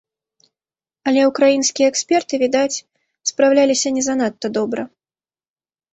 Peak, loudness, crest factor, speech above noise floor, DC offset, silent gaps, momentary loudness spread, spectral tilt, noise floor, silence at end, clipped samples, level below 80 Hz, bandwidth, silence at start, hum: -2 dBFS; -17 LUFS; 16 dB; over 73 dB; under 0.1%; none; 11 LU; -2.5 dB/octave; under -90 dBFS; 1.05 s; under 0.1%; -64 dBFS; 8.2 kHz; 1.05 s; none